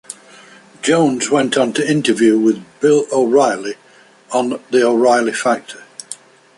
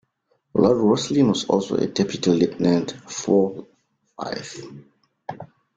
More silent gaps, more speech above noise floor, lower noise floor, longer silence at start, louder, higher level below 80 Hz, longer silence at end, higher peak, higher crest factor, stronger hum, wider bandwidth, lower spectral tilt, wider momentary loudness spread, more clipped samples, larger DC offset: neither; second, 28 dB vs 48 dB; second, -43 dBFS vs -69 dBFS; second, 0.1 s vs 0.55 s; first, -15 LUFS vs -21 LUFS; about the same, -62 dBFS vs -58 dBFS; first, 0.45 s vs 0.3 s; about the same, -2 dBFS vs -4 dBFS; about the same, 14 dB vs 18 dB; neither; first, 11.5 kHz vs 9.2 kHz; about the same, -4.5 dB/octave vs -5.5 dB/octave; about the same, 20 LU vs 19 LU; neither; neither